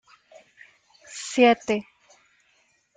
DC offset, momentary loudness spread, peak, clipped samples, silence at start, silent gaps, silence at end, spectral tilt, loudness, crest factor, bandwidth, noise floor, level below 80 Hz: under 0.1%; 18 LU; -6 dBFS; under 0.1%; 1.1 s; none; 1.15 s; -3.5 dB/octave; -22 LUFS; 22 dB; 9.6 kHz; -66 dBFS; -72 dBFS